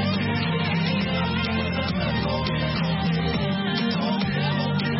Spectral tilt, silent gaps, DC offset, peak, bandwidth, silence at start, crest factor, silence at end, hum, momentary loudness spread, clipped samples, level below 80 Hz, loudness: -10 dB/octave; none; under 0.1%; -12 dBFS; 5.8 kHz; 0 s; 12 dB; 0 s; none; 1 LU; under 0.1%; -42 dBFS; -24 LUFS